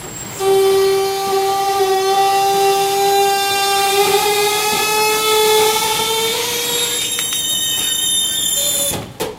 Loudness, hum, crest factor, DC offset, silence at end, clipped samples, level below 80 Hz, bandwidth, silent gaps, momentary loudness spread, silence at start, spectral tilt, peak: -14 LUFS; none; 14 dB; under 0.1%; 0 s; under 0.1%; -50 dBFS; 16 kHz; none; 4 LU; 0 s; -1 dB/octave; -2 dBFS